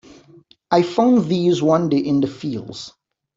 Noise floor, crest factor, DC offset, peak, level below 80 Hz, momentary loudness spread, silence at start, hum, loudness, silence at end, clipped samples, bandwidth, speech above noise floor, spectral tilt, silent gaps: -50 dBFS; 16 dB; under 0.1%; -2 dBFS; -60 dBFS; 16 LU; 0.7 s; none; -18 LUFS; 0.5 s; under 0.1%; 7.8 kHz; 33 dB; -7 dB/octave; none